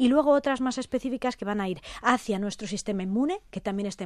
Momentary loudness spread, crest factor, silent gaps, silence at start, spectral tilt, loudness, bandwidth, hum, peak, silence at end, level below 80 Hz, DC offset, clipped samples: 9 LU; 20 dB; none; 0 s; -5 dB/octave; -28 LUFS; 12.5 kHz; none; -6 dBFS; 0 s; -56 dBFS; under 0.1%; under 0.1%